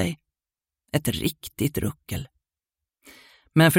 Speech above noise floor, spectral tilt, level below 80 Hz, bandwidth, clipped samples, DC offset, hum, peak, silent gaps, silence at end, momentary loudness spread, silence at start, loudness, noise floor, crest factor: over 63 dB; -5 dB/octave; -50 dBFS; 17 kHz; under 0.1%; under 0.1%; none; -2 dBFS; none; 0 s; 10 LU; 0 s; -27 LUFS; under -90 dBFS; 24 dB